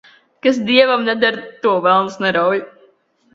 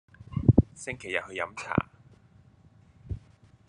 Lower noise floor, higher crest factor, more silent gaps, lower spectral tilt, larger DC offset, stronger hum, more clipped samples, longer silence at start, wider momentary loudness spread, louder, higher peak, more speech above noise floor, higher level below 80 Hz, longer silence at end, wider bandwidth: about the same, -55 dBFS vs -58 dBFS; second, 16 dB vs 26 dB; neither; second, -5 dB/octave vs -7 dB/octave; neither; neither; neither; first, 0.45 s vs 0.3 s; second, 7 LU vs 19 LU; first, -16 LUFS vs -28 LUFS; first, 0 dBFS vs -4 dBFS; first, 40 dB vs 25 dB; second, -62 dBFS vs -46 dBFS; first, 0.7 s vs 0.5 s; second, 7.6 kHz vs 10.5 kHz